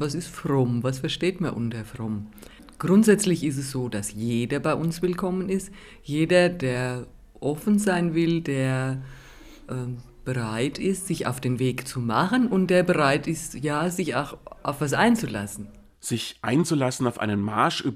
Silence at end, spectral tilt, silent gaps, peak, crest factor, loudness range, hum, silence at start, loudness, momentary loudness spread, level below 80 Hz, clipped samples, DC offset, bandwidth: 0 s; -5.5 dB/octave; none; -6 dBFS; 20 dB; 3 LU; none; 0 s; -25 LUFS; 13 LU; -52 dBFS; under 0.1%; under 0.1%; 16 kHz